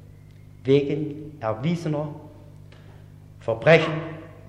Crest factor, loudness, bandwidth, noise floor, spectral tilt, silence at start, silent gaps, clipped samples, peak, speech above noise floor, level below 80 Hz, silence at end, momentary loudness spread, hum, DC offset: 20 dB; -23 LUFS; 9.4 kHz; -46 dBFS; -7 dB/octave; 0.65 s; none; under 0.1%; -4 dBFS; 24 dB; -56 dBFS; 0.1 s; 17 LU; 50 Hz at -45 dBFS; under 0.1%